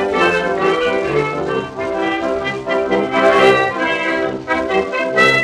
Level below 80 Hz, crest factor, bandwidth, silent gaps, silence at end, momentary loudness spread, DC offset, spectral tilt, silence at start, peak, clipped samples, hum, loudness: -46 dBFS; 14 dB; 11.5 kHz; none; 0 s; 8 LU; under 0.1%; -5 dB/octave; 0 s; -2 dBFS; under 0.1%; none; -16 LUFS